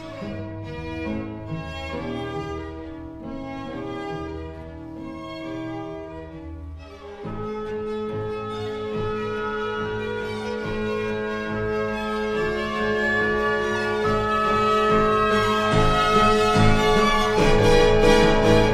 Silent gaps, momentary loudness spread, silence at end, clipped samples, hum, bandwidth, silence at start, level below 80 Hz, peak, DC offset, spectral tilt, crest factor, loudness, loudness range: none; 18 LU; 0 s; under 0.1%; none; 14.5 kHz; 0 s; -32 dBFS; -4 dBFS; under 0.1%; -5.5 dB/octave; 18 dB; -22 LUFS; 15 LU